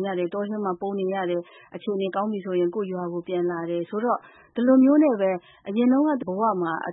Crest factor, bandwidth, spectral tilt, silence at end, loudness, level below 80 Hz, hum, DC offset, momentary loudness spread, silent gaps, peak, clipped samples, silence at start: 16 dB; 4 kHz; -11.5 dB/octave; 0 s; -24 LUFS; -74 dBFS; none; under 0.1%; 12 LU; none; -8 dBFS; under 0.1%; 0 s